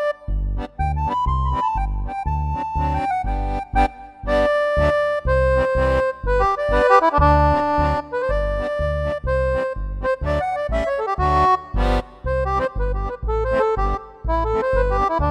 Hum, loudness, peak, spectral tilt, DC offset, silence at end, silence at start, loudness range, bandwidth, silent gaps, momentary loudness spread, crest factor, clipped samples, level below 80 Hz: none; -20 LUFS; -2 dBFS; -7.5 dB/octave; under 0.1%; 0 s; 0 s; 5 LU; 10 kHz; none; 9 LU; 18 dB; under 0.1%; -26 dBFS